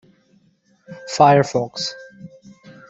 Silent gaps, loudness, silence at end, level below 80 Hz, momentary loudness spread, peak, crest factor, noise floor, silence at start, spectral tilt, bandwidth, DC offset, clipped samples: none; -17 LUFS; 0.65 s; -62 dBFS; 23 LU; -2 dBFS; 20 dB; -59 dBFS; 0.9 s; -5 dB/octave; 8 kHz; under 0.1%; under 0.1%